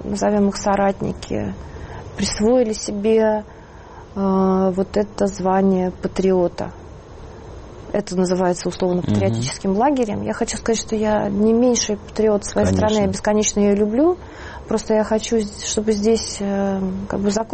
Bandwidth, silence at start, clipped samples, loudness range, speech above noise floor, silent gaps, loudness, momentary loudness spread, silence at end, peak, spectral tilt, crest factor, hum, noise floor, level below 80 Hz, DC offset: 8.8 kHz; 0 s; under 0.1%; 4 LU; 20 dB; none; -19 LUFS; 16 LU; 0 s; -6 dBFS; -5.5 dB/octave; 12 dB; none; -39 dBFS; -40 dBFS; under 0.1%